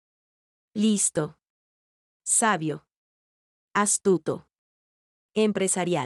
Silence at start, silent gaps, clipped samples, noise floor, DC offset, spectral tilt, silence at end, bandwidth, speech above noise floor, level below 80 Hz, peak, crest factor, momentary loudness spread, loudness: 0.75 s; 1.50-2.20 s, 2.91-3.68 s, 4.58-5.29 s; under 0.1%; under -90 dBFS; under 0.1%; -3.5 dB/octave; 0 s; 13.5 kHz; over 66 dB; -72 dBFS; -10 dBFS; 18 dB; 14 LU; -24 LUFS